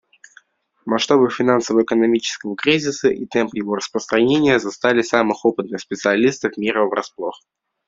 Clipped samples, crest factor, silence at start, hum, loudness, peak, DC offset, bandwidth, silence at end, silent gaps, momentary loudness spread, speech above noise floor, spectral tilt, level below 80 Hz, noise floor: under 0.1%; 18 dB; 0.85 s; none; -18 LUFS; 0 dBFS; under 0.1%; 7.8 kHz; 0.5 s; none; 9 LU; 35 dB; -4.5 dB/octave; -60 dBFS; -53 dBFS